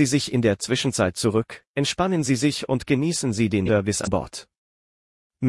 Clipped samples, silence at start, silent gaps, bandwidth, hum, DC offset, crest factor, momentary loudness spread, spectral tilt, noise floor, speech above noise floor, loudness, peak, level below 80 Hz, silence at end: under 0.1%; 0 s; 1.67-1.74 s, 4.57-5.30 s; 12 kHz; none; under 0.1%; 16 dB; 6 LU; -5 dB/octave; under -90 dBFS; over 68 dB; -23 LUFS; -6 dBFS; -52 dBFS; 0 s